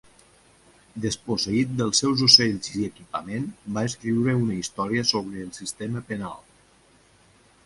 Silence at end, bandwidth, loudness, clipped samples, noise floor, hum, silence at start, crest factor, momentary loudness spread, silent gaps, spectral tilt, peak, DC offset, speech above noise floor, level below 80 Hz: 1.25 s; 11.5 kHz; -23 LUFS; under 0.1%; -58 dBFS; none; 0.95 s; 24 dB; 18 LU; none; -3.5 dB/octave; 0 dBFS; under 0.1%; 33 dB; -56 dBFS